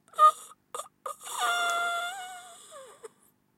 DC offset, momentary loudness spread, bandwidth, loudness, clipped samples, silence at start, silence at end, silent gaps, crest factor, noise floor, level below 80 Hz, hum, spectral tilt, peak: under 0.1%; 25 LU; 16 kHz; -27 LUFS; under 0.1%; 0.15 s; 0.5 s; none; 20 dB; -66 dBFS; -88 dBFS; 50 Hz at -75 dBFS; 1.5 dB/octave; -10 dBFS